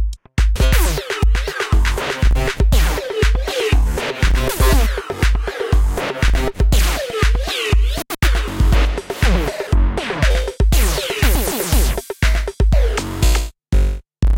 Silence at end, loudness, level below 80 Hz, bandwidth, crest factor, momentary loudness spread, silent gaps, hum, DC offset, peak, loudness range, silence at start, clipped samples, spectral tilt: 0 s; -18 LUFS; -16 dBFS; 16.5 kHz; 12 dB; 4 LU; none; none; under 0.1%; -2 dBFS; 1 LU; 0 s; under 0.1%; -4.5 dB/octave